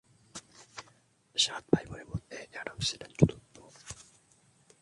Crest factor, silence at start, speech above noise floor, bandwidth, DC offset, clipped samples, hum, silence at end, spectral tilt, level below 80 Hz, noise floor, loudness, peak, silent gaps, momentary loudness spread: 28 dB; 0.35 s; 35 dB; 11.5 kHz; under 0.1%; under 0.1%; none; 0.8 s; -4.5 dB/octave; -54 dBFS; -66 dBFS; -32 LUFS; -8 dBFS; none; 20 LU